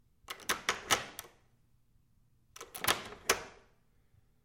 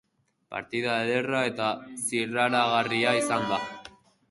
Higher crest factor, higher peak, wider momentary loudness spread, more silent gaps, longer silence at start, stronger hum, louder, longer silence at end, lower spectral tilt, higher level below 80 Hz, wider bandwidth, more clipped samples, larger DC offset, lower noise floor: first, 32 dB vs 20 dB; about the same, -8 dBFS vs -8 dBFS; first, 17 LU vs 12 LU; neither; second, 0.3 s vs 0.5 s; neither; second, -34 LUFS vs -26 LUFS; first, 0.9 s vs 0.4 s; second, -0.5 dB/octave vs -3.5 dB/octave; about the same, -64 dBFS vs -68 dBFS; first, 16.5 kHz vs 12 kHz; neither; neither; first, -70 dBFS vs -52 dBFS